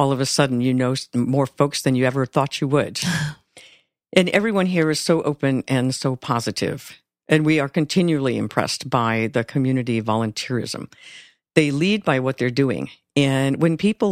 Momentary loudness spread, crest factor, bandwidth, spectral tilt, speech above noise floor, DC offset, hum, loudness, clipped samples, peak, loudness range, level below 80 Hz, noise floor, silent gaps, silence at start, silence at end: 6 LU; 20 dB; 15.5 kHz; -5.5 dB/octave; 33 dB; under 0.1%; none; -21 LUFS; under 0.1%; 0 dBFS; 2 LU; -56 dBFS; -53 dBFS; none; 0 s; 0 s